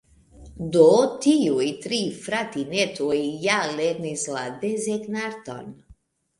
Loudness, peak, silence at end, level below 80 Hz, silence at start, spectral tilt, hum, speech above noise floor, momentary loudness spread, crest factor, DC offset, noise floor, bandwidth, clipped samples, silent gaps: -23 LUFS; -4 dBFS; 0.65 s; -56 dBFS; 0.4 s; -4 dB/octave; none; 32 dB; 14 LU; 20 dB; under 0.1%; -55 dBFS; 11.5 kHz; under 0.1%; none